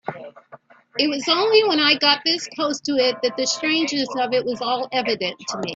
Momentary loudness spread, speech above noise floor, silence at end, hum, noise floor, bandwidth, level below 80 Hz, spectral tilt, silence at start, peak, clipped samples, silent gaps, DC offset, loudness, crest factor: 9 LU; 27 dB; 0 s; none; -48 dBFS; 8 kHz; -68 dBFS; -2.5 dB/octave; 0.05 s; -2 dBFS; under 0.1%; none; under 0.1%; -20 LUFS; 20 dB